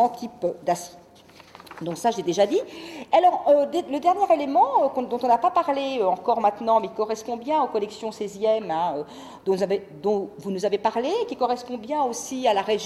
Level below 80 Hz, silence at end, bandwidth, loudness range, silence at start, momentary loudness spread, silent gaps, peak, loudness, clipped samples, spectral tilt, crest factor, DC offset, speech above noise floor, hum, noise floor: -66 dBFS; 0 s; 14 kHz; 5 LU; 0 s; 11 LU; none; -8 dBFS; -24 LUFS; under 0.1%; -4.5 dB/octave; 16 dB; under 0.1%; 27 dB; none; -50 dBFS